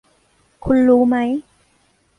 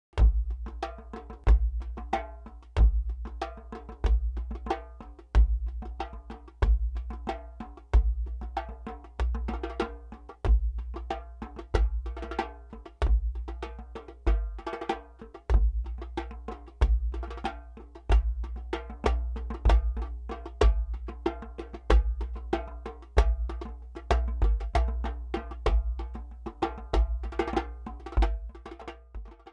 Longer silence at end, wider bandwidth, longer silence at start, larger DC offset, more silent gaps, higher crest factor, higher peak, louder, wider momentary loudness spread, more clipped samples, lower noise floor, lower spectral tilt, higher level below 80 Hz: first, 0.75 s vs 0 s; second, 3.8 kHz vs 6.6 kHz; first, 0.65 s vs 0.15 s; neither; neither; about the same, 16 dB vs 20 dB; first, -4 dBFS vs -8 dBFS; first, -16 LUFS vs -31 LUFS; second, 13 LU vs 17 LU; neither; first, -60 dBFS vs -48 dBFS; about the same, -8 dB/octave vs -7.5 dB/octave; second, -44 dBFS vs -30 dBFS